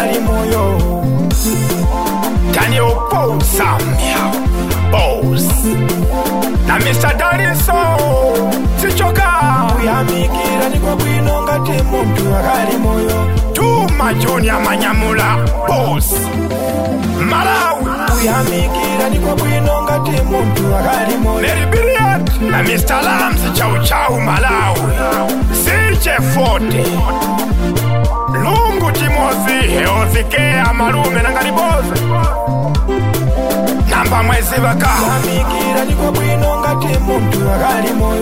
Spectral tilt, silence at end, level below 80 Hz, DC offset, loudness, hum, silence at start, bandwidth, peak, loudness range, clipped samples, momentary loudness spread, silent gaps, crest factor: -5 dB/octave; 0 s; -20 dBFS; 2%; -13 LUFS; none; 0 s; 16.5 kHz; 0 dBFS; 1 LU; under 0.1%; 3 LU; none; 12 dB